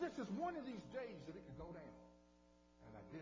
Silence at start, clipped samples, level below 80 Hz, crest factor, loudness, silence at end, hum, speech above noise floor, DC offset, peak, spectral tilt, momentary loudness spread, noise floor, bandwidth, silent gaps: 0 s; under 0.1%; -70 dBFS; 18 dB; -50 LUFS; 0 s; 60 Hz at -65 dBFS; 19 dB; under 0.1%; -32 dBFS; -6.5 dB/octave; 18 LU; -71 dBFS; 7.6 kHz; none